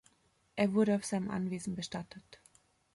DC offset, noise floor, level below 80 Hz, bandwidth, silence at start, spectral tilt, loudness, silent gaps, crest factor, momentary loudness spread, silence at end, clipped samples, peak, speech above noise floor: under 0.1%; -72 dBFS; -70 dBFS; 11.5 kHz; 0.55 s; -6 dB/octave; -34 LUFS; none; 18 dB; 17 LU; 0.6 s; under 0.1%; -18 dBFS; 38 dB